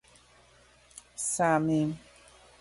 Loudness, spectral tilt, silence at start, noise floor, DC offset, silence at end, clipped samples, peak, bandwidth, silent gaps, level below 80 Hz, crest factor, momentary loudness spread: -28 LUFS; -5 dB/octave; 1.2 s; -60 dBFS; under 0.1%; 0.6 s; under 0.1%; -14 dBFS; 11.5 kHz; none; -64 dBFS; 18 dB; 23 LU